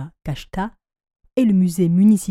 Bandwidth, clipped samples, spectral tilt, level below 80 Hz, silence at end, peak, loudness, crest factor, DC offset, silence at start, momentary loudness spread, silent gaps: 14.5 kHz; under 0.1%; -7.5 dB/octave; -44 dBFS; 0 s; -6 dBFS; -18 LUFS; 12 dB; under 0.1%; 0 s; 15 LU; none